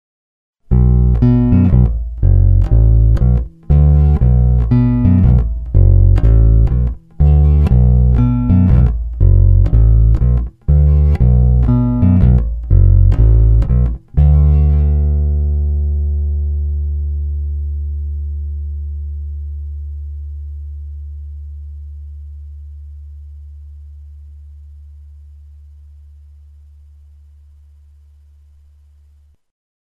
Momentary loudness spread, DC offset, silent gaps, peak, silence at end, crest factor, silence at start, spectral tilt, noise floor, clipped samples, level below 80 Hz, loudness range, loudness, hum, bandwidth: 19 LU; under 0.1%; none; 0 dBFS; 5.45 s; 12 dB; 0.7 s; -12 dB/octave; -48 dBFS; under 0.1%; -14 dBFS; 18 LU; -13 LUFS; none; 2.9 kHz